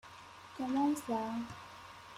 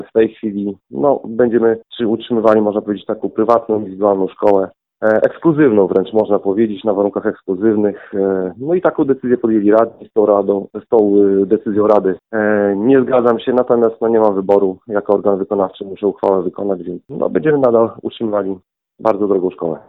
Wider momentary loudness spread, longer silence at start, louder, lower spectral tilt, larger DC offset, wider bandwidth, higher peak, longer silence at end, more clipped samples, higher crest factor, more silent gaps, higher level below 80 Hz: first, 19 LU vs 8 LU; about the same, 0.05 s vs 0 s; second, -36 LUFS vs -15 LUFS; second, -5 dB/octave vs -9.5 dB/octave; neither; first, 15.5 kHz vs 4.5 kHz; second, -22 dBFS vs 0 dBFS; about the same, 0 s vs 0.1 s; neither; about the same, 16 dB vs 14 dB; neither; second, -72 dBFS vs -56 dBFS